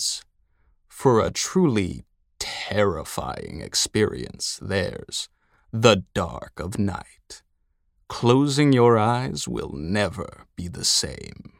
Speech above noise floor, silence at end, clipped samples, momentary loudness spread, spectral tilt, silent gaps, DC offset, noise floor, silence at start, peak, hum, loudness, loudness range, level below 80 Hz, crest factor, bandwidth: 45 dB; 0.1 s; under 0.1%; 16 LU; -4.5 dB/octave; none; under 0.1%; -68 dBFS; 0 s; -2 dBFS; none; -23 LUFS; 4 LU; -48 dBFS; 22 dB; 16.5 kHz